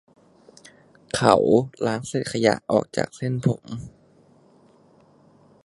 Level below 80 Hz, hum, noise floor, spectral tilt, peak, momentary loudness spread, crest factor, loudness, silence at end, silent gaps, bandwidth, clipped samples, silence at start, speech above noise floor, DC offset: -56 dBFS; none; -56 dBFS; -6 dB/octave; 0 dBFS; 13 LU; 24 dB; -22 LUFS; 1.75 s; none; 11.5 kHz; under 0.1%; 1.15 s; 34 dB; under 0.1%